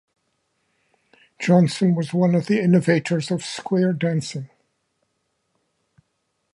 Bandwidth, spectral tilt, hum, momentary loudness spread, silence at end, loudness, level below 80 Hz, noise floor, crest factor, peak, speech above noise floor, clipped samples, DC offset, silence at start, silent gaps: 11 kHz; -7 dB/octave; none; 10 LU; 2.1 s; -20 LUFS; -68 dBFS; -73 dBFS; 20 dB; -4 dBFS; 54 dB; under 0.1%; under 0.1%; 1.4 s; none